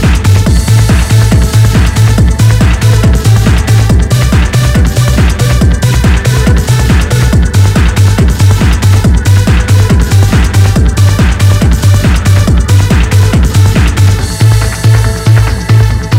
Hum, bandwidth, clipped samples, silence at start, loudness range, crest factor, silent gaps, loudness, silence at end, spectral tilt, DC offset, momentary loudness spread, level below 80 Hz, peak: none; 16 kHz; 7%; 0 s; 1 LU; 6 dB; none; -7 LUFS; 0 s; -5.5 dB/octave; under 0.1%; 1 LU; -12 dBFS; 0 dBFS